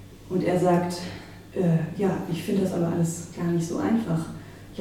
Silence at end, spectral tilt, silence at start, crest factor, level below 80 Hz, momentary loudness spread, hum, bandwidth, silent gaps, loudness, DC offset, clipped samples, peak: 0 s; -7 dB/octave; 0 s; 16 dB; -54 dBFS; 14 LU; none; 15 kHz; none; -26 LUFS; under 0.1%; under 0.1%; -10 dBFS